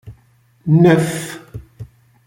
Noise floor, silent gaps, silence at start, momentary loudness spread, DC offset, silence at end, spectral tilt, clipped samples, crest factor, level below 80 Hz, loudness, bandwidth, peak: -54 dBFS; none; 0.05 s; 23 LU; under 0.1%; 0.45 s; -7 dB/octave; under 0.1%; 16 dB; -48 dBFS; -14 LUFS; 17 kHz; -2 dBFS